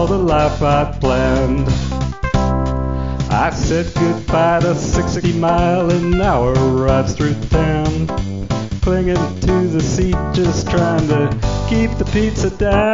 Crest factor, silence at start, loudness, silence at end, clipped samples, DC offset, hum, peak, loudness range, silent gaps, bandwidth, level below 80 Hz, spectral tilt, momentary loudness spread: 14 dB; 0 s; -16 LUFS; 0 s; under 0.1%; 1%; none; -2 dBFS; 2 LU; none; 7.6 kHz; -24 dBFS; -6.5 dB/octave; 5 LU